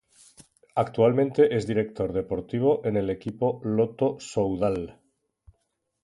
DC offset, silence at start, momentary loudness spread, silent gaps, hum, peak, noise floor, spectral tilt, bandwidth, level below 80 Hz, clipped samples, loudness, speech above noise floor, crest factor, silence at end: under 0.1%; 0.75 s; 9 LU; none; none; -8 dBFS; -76 dBFS; -7.5 dB/octave; 11.5 kHz; -54 dBFS; under 0.1%; -26 LUFS; 51 dB; 18 dB; 1.1 s